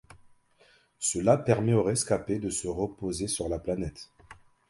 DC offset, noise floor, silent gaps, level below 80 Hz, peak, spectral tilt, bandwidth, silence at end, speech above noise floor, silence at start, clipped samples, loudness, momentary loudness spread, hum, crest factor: under 0.1%; -63 dBFS; none; -52 dBFS; -8 dBFS; -5 dB/octave; 11.5 kHz; 0.35 s; 35 dB; 0.15 s; under 0.1%; -28 LUFS; 10 LU; none; 22 dB